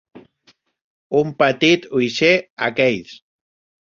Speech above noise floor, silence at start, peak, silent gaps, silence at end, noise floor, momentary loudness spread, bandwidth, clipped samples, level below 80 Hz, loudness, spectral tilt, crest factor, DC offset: 41 dB; 0.15 s; -2 dBFS; 0.81-1.10 s, 2.50-2.57 s; 0.65 s; -58 dBFS; 6 LU; 7.6 kHz; under 0.1%; -60 dBFS; -17 LUFS; -5 dB/octave; 20 dB; under 0.1%